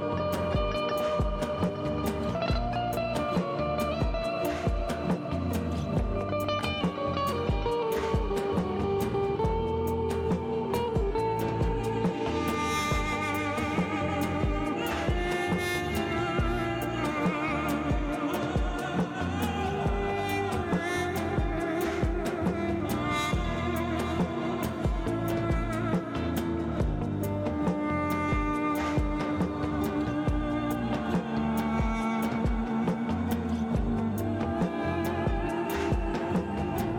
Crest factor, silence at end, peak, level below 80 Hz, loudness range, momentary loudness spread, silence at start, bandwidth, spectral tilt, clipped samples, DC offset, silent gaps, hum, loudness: 14 dB; 0 s; -14 dBFS; -38 dBFS; 1 LU; 2 LU; 0 s; 19 kHz; -6.5 dB/octave; under 0.1%; under 0.1%; none; none; -29 LUFS